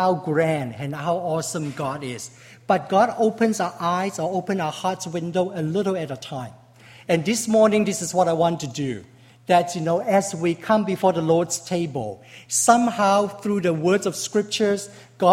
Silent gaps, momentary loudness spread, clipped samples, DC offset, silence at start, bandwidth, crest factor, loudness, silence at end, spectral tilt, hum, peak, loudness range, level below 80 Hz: none; 12 LU; under 0.1%; under 0.1%; 0 s; 16 kHz; 20 dB; -22 LUFS; 0 s; -4.5 dB/octave; none; -2 dBFS; 4 LU; -62 dBFS